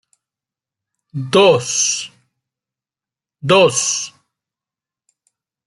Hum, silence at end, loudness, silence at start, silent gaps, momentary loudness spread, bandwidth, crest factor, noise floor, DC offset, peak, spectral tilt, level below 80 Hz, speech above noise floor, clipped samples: none; 1.6 s; -14 LUFS; 1.15 s; none; 18 LU; 12 kHz; 20 dB; -89 dBFS; under 0.1%; 0 dBFS; -3 dB/octave; -64 dBFS; 75 dB; under 0.1%